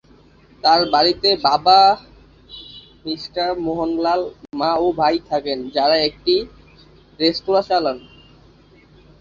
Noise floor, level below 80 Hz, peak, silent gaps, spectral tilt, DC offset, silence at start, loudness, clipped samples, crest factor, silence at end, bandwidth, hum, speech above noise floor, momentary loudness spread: -50 dBFS; -50 dBFS; -2 dBFS; none; -5 dB/octave; under 0.1%; 0.65 s; -18 LUFS; under 0.1%; 18 dB; 1.2 s; 7.2 kHz; none; 32 dB; 20 LU